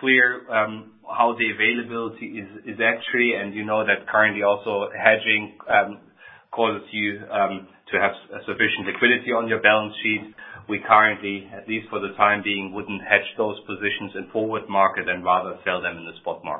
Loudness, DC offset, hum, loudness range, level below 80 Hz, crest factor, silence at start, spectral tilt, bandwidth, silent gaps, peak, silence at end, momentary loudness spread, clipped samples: -22 LUFS; under 0.1%; none; 3 LU; -62 dBFS; 22 dB; 0 s; -9 dB/octave; 4 kHz; none; 0 dBFS; 0 s; 14 LU; under 0.1%